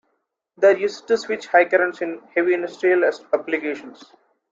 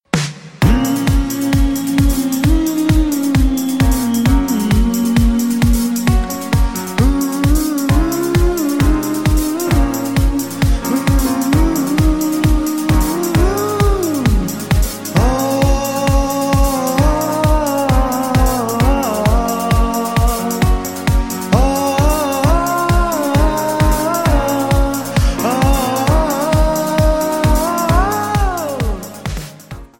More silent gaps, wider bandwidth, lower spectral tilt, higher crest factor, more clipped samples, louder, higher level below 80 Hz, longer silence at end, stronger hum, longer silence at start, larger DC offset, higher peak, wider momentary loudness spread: neither; second, 7.6 kHz vs 17 kHz; about the same, -4.5 dB/octave vs -5.5 dB/octave; first, 20 dB vs 14 dB; neither; second, -20 LUFS vs -15 LUFS; second, -72 dBFS vs -18 dBFS; first, 0.6 s vs 0.15 s; neither; first, 0.6 s vs 0.15 s; second, under 0.1% vs 0.3%; about the same, -2 dBFS vs 0 dBFS; first, 8 LU vs 3 LU